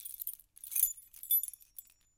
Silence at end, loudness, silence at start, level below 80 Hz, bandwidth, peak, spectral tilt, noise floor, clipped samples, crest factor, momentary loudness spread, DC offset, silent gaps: 0.35 s; -32 LUFS; 0 s; -74 dBFS; 17 kHz; -14 dBFS; 4 dB/octave; -56 dBFS; under 0.1%; 24 dB; 21 LU; under 0.1%; none